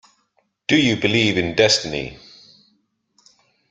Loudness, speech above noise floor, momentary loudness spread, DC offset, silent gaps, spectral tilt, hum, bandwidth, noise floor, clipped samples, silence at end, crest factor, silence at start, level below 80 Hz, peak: -18 LUFS; 49 dB; 13 LU; under 0.1%; none; -4 dB/octave; none; 9.4 kHz; -67 dBFS; under 0.1%; 1.55 s; 20 dB; 0.7 s; -52 dBFS; -2 dBFS